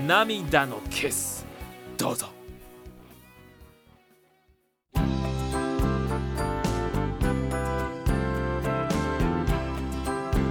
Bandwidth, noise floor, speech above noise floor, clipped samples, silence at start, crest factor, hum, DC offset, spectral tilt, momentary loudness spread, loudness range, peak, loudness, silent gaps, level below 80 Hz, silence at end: 19 kHz; -66 dBFS; 40 dB; under 0.1%; 0 s; 22 dB; none; under 0.1%; -5 dB/octave; 14 LU; 9 LU; -4 dBFS; -28 LUFS; none; -36 dBFS; 0 s